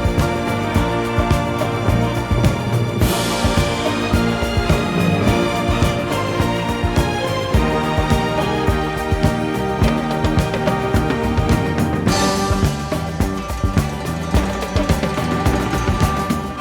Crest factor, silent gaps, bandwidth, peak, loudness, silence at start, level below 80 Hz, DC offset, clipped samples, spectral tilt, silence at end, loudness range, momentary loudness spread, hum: 16 dB; none; over 20 kHz; -2 dBFS; -18 LUFS; 0 s; -26 dBFS; under 0.1%; under 0.1%; -6 dB/octave; 0 s; 2 LU; 3 LU; none